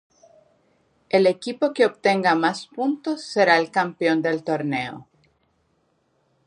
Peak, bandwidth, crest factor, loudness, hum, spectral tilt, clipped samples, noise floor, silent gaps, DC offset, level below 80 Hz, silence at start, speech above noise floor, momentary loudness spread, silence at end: -4 dBFS; 10.5 kHz; 20 dB; -21 LUFS; none; -5 dB/octave; under 0.1%; -67 dBFS; none; under 0.1%; -70 dBFS; 1.15 s; 46 dB; 9 LU; 1.45 s